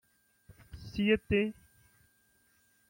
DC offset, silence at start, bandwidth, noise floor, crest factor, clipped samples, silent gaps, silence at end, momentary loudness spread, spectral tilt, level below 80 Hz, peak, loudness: under 0.1%; 0.75 s; 16.5 kHz; -70 dBFS; 22 dB; under 0.1%; none; 1.4 s; 22 LU; -7 dB/octave; -56 dBFS; -14 dBFS; -31 LUFS